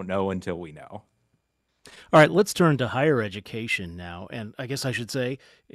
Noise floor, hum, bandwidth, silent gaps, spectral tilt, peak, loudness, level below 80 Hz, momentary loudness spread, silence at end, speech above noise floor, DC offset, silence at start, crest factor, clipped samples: -74 dBFS; none; 14.5 kHz; none; -5.5 dB/octave; -4 dBFS; -24 LUFS; -60 dBFS; 19 LU; 0.4 s; 49 dB; under 0.1%; 0 s; 20 dB; under 0.1%